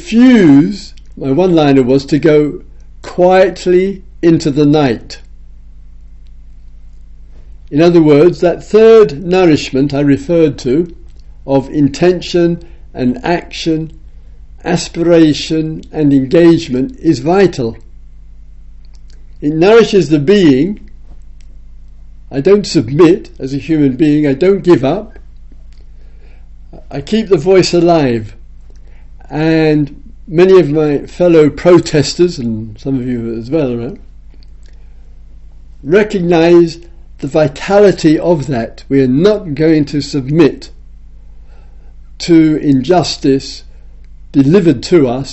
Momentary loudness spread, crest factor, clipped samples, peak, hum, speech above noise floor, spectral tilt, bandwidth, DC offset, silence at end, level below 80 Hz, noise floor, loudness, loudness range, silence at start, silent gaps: 13 LU; 12 dB; 0.3%; 0 dBFS; 50 Hz at -35 dBFS; 23 dB; -6.5 dB/octave; 8.2 kHz; under 0.1%; 0 s; -34 dBFS; -33 dBFS; -11 LUFS; 5 LU; 0 s; none